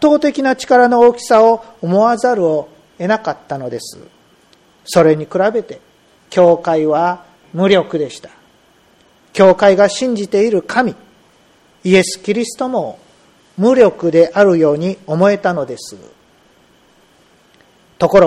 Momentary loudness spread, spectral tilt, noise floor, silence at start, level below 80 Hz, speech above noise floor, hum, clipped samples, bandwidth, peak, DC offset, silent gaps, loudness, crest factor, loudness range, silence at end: 14 LU; -5.5 dB/octave; -51 dBFS; 0 s; -52 dBFS; 38 dB; none; under 0.1%; 15 kHz; 0 dBFS; under 0.1%; none; -13 LUFS; 14 dB; 5 LU; 0 s